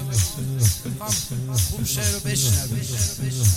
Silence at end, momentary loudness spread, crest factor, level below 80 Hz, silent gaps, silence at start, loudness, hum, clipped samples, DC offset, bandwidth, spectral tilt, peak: 0 s; 4 LU; 16 dB; -38 dBFS; none; 0 s; -23 LUFS; none; under 0.1%; under 0.1%; 17 kHz; -3.5 dB/octave; -6 dBFS